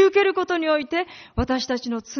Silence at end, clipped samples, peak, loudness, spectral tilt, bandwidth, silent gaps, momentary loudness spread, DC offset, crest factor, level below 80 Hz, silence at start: 0 s; under 0.1%; -6 dBFS; -23 LUFS; -3.5 dB/octave; 6.6 kHz; none; 8 LU; under 0.1%; 16 dB; -40 dBFS; 0 s